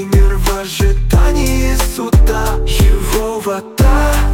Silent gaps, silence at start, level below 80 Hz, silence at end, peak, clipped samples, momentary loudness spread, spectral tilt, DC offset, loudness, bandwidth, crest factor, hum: none; 0 s; -12 dBFS; 0 s; 0 dBFS; under 0.1%; 5 LU; -5.5 dB/octave; under 0.1%; -14 LUFS; 17 kHz; 10 dB; none